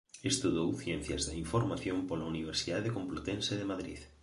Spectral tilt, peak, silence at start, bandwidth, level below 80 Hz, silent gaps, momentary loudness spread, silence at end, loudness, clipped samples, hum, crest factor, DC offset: -4.5 dB/octave; -18 dBFS; 0.15 s; 11.5 kHz; -52 dBFS; none; 6 LU; 0.15 s; -35 LUFS; under 0.1%; none; 18 dB; under 0.1%